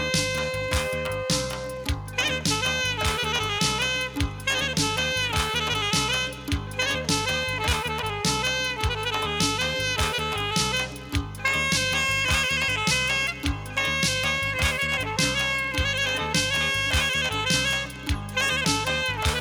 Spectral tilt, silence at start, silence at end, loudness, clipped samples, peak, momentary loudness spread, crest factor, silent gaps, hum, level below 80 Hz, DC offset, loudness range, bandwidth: -2.5 dB/octave; 0 s; 0 s; -24 LUFS; under 0.1%; -10 dBFS; 6 LU; 16 dB; none; none; -38 dBFS; under 0.1%; 2 LU; over 20 kHz